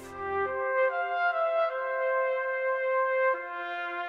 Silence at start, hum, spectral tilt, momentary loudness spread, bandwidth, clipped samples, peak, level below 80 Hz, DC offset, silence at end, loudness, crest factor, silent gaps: 0 s; none; -4.5 dB/octave; 6 LU; 7.6 kHz; under 0.1%; -16 dBFS; -72 dBFS; under 0.1%; 0 s; -28 LUFS; 12 dB; none